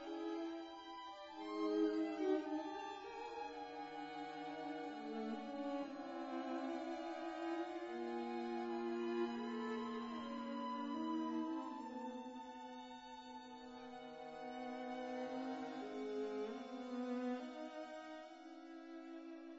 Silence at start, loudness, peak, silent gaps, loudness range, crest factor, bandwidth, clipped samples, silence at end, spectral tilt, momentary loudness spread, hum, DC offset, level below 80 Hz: 0 s; -46 LUFS; -26 dBFS; none; 5 LU; 18 dB; 7.6 kHz; under 0.1%; 0 s; -3 dB/octave; 12 LU; none; under 0.1%; -82 dBFS